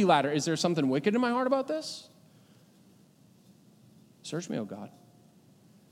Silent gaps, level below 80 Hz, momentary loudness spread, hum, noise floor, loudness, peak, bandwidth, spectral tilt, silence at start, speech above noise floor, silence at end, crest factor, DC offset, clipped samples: none; -84 dBFS; 18 LU; none; -60 dBFS; -29 LUFS; -10 dBFS; 16 kHz; -5 dB/octave; 0 s; 32 dB; 1.05 s; 22 dB; under 0.1%; under 0.1%